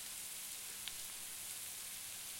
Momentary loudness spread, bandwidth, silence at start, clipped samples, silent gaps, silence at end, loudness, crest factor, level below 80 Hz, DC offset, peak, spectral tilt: 1 LU; 16.5 kHz; 0 s; under 0.1%; none; 0 s; -44 LUFS; 24 dB; -76 dBFS; under 0.1%; -22 dBFS; 1 dB/octave